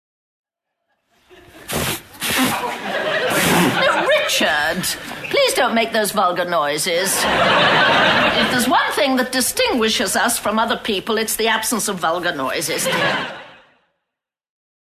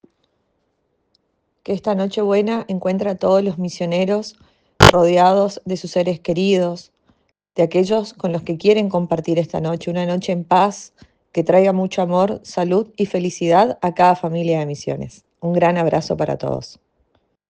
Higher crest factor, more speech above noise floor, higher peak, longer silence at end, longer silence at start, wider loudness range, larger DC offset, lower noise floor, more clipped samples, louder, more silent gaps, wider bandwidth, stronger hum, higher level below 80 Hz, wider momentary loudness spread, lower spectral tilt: about the same, 16 dB vs 18 dB; first, 64 dB vs 50 dB; second, -4 dBFS vs 0 dBFS; first, 1.35 s vs 0.8 s; second, 1.55 s vs 1.7 s; about the same, 5 LU vs 5 LU; neither; first, -82 dBFS vs -68 dBFS; neither; about the same, -17 LUFS vs -18 LUFS; neither; first, 14.5 kHz vs 10 kHz; neither; about the same, -48 dBFS vs -44 dBFS; second, 8 LU vs 11 LU; second, -2.5 dB/octave vs -6 dB/octave